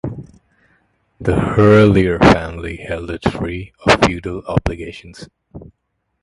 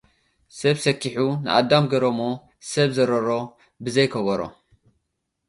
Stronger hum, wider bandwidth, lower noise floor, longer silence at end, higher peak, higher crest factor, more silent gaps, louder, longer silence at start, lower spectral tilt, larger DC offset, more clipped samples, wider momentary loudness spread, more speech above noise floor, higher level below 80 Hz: neither; about the same, 11.5 kHz vs 11.5 kHz; second, -71 dBFS vs -78 dBFS; second, 0.6 s vs 1 s; about the same, 0 dBFS vs -2 dBFS; about the same, 16 dB vs 20 dB; neither; first, -15 LUFS vs -22 LUFS; second, 0.05 s vs 0.55 s; about the same, -6.5 dB/octave vs -5.5 dB/octave; neither; neither; first, 18 LU vs 11 LU; about the same, 56 dB vs 56 dB; first, -32 dBFS vs -60 dBFS